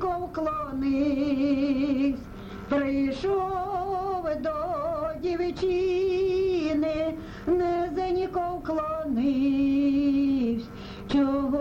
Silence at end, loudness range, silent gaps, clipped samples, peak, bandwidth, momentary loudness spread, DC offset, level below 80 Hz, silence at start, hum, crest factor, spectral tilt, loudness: 0 s; 2 LU; none; under 0.1%; -14 dBFS; 7.2 kHz; 6 LU; under 0.1%; -46 dBFS; 0 s; none; 12 dB; -7.5 dB/octave; -27 LUFS